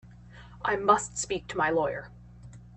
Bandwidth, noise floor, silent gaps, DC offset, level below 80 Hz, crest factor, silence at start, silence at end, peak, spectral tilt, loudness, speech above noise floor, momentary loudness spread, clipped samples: 8.8 kHz; -49 dBFS; none; under 0.1%; -54 dBFS; 24 dB; 0.05 s; 0 s; -6 dBFS; -3.5 dB/octave; -28 LUFS; 22 dB; 12 LU; under 0.1%